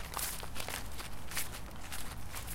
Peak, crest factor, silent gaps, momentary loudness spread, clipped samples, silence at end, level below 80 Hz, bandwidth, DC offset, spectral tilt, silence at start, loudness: -18 dBFS; 20 dB; none; 7 LU; under 0.1%; 0 s; -50 dBFS; 17 kHz; under 0.1%; -2 dB/octave; 0 s; -41 LUFS